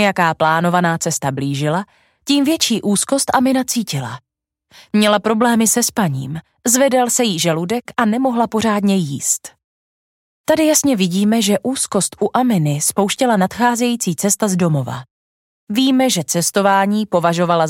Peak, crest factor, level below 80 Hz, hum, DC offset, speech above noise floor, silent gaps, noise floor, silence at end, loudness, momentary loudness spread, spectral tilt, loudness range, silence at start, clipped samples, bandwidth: 0 dBFS; 16 dB; -58 dBFS; none; under 0.1%; over 74 dB; 9.64-10.44 s, 15.11-15.67 s; under -90 dBFS; 0 s; -16 LUFS; 7 LU; -4 dB/octave; 2 LU; 0 s; under 0.1%; 17 kHz